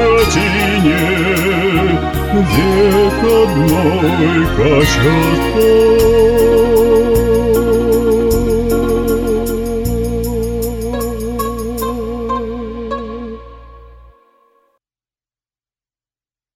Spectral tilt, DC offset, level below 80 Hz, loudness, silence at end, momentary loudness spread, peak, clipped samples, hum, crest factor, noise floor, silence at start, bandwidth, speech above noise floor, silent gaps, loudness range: -6 dB/octave; under 0.1%; -26 dBFS; -13 LUFS; 2.8 s; 10 LU; -2 dBFS; under 0.1%; none; 12 dB; under -90 dBFS; 0 s; 17.5 kHz; over 80 dB; none; 13 LU